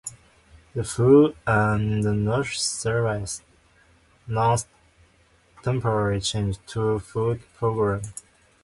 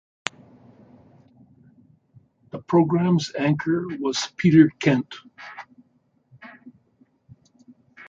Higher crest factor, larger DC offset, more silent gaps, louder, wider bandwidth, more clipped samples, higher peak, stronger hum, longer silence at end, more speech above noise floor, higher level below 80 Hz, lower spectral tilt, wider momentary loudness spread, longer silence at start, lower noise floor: second, 18 dB vs 24 dB; neither; neither; second, -24 LUFS vs -21 LUFS; first, 11.5 kHz vs 7.8 kHz; neither; second, -6 dBFS vs -2 dBFS; neither; first, 0.5 s vs 0.05 s; second, 37 dB vs 44 dB; first, -48 dBFS vs -62 dBFS; about the same, -5.5 dB/octave vs -6 dB/octave; second, 14 LU vs 24 LU; second, 0.05 s vs 2.55 s; second, -59 dBFS vs -65 dBFS